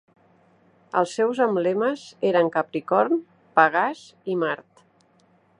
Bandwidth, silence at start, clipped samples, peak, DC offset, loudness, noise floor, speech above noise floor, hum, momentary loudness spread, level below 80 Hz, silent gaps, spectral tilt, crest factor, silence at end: 10.5 kHz; 0.95 s; under 0.1%; -2 dBFS; under 0.1%; -23 LUFS; -60 dBFS; 38 dB; none; 8 LU; -78 dBFS; none; -5.5 dB/octave; 22 dB; 1.05 s